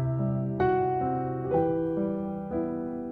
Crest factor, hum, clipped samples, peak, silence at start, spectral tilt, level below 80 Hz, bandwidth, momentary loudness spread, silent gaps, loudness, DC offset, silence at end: 16 dB; none; under 0.1%; -12 dBFS; 0 s; -11.5 dB/octave; -52 dBFS; 4.8 kHz; 7 LU; none; -29 LUFS; under 0.1%; 0 s